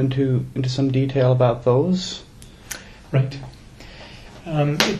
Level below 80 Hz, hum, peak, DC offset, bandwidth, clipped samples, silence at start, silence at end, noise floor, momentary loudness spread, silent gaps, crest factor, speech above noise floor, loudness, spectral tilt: -46 dBFS; none; 0 dBFS; under 0.1%; 13.5 kHz; under 0.1%; 0 s; 0 s; -41 dBFS; 22 LU; none; 22 dB; 22 dB; -21 LUFS; -6 dB/octave